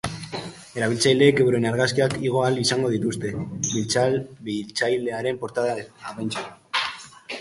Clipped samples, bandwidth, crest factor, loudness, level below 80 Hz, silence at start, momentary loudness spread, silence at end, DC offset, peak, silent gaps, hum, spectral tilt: under 0.1%; 11.5 kHz; 20 dB; -23 LUFS; -56 dBFS; 0.05 s; 14 LU; 0 s; under 0.1%; -4 dBFS; none; none; -4.5 dB/octave